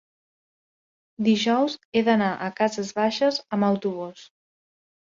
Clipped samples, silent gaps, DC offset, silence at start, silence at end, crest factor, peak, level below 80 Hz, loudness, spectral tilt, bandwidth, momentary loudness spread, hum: under 0.1%; 1.85-1.92 s; under 0.1%; 1.2 s; 0.8 s; 18 dB; -8 dBFS; -70 dBFS; -23 LUFS; -5 dB/octave; 7.6 kHz; 6 LU; none